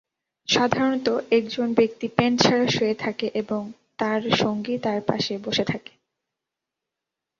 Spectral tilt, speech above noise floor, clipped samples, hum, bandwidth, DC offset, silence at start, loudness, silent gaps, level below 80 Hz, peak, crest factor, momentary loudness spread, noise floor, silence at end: -4.5 dB/octave; 63 dB; under 0.1%; none; 7.6 kHz; under 0.1%; 0.5 s; -23 LUFS; none; -60 dBFS; -2 dBFS; 22 dB; 10 LU; -86 dBFS; 1.6 s